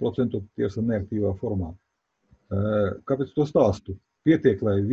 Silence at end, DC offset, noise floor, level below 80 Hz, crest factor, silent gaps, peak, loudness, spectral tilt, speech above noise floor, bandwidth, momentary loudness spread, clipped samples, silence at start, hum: 0 s; under 0.1%; -63 dBFS; -46 dBFS; 18 dB; none; -6 dBFS; -25 LUFS; -9 dB/octave; 39 dB; 7.6 kHz; 11 LU; under 0.1%; 0 s; none